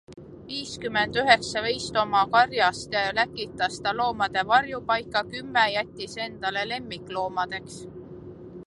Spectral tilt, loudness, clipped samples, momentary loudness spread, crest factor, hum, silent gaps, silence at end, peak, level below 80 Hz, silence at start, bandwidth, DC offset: -3 dB/octave; -25 LUFS; under 0.1%; 15 LU; 24 dB; none; none; 0.05 s; -2 dBFS; -56 dBFS; 0.1 s; 11.5 kHz; under 0.1%